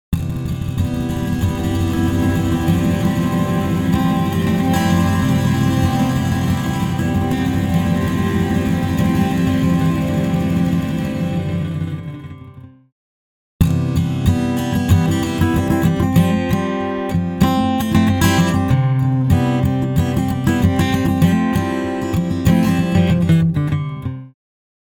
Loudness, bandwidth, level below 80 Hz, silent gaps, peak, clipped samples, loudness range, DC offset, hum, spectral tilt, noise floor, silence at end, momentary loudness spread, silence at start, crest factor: -17 LUFS; 18 kHz; -34 dBFS; 12.92-13.59 s; -2 dBFS; under 0.1%; 4 LU; under 0.1%; none; -7 dB/octave; -38 dBFS; 0.55 s; 6 LU; 0.1 s; 16 dB